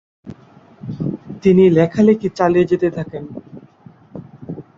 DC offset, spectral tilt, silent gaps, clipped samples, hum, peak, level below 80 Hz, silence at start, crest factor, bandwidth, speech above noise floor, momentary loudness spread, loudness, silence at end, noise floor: under 0.1%; -8.5 dB/octave; none; under 0.1%; none; -2 dBFS; -50 dBFS; 0.25 s; 16 dB; 7.6 kHz; 32 dB; 23 LU; -15 LUFS; 0.15 s; -46 dBFS